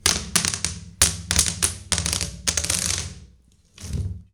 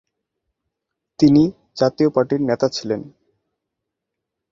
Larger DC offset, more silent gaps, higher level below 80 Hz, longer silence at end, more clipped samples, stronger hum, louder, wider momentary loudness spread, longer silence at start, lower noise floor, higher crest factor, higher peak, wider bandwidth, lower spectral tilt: neither; neither; first, -36 dBFS vs -56 dBFS; second, 0.1 s vs 1.45 s; neither; neither; second, -22 LUFS vs -18 LUFS; about the same, 12 LU vs 11 LU; second, 0.05 s vs 1.2 s; second, -55 dBFS vs -81 dBFS; about the same, 22 dB vs 18 dB; about the same, -4 dBFS vs -2 dBFS; first, over 20 kHz vs 7.4 kHz; second, -1.5 dB/octave vs -7 dB/octave